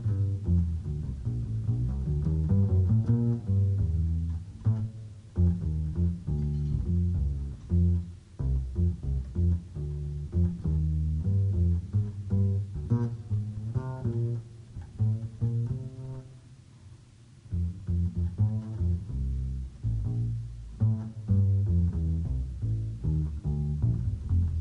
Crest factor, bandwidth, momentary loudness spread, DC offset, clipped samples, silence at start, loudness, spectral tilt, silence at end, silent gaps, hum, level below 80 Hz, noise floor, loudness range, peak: 14 dB; 2 kHz; 9 LU; under 0.1%; under 0.1%; 0 s; -30 LUFS; -10.5 dB/octave; 0 s; none; none; -36 dBFS; -53 dBFS; 6 LU; -14 dBFS